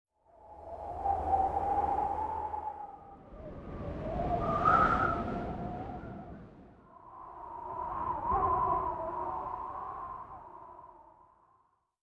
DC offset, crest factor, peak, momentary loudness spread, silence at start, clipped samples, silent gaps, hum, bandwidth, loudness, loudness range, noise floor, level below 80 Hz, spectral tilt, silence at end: under 0.1%; 22 dB; -14 dBFS; 21 LU; 0.4 s; under 0.1%; none; none; 11 kHz; -33 LUFS; 6 LU; -71 dBFS; -50 dBFS; -8 dB/octave; 1 s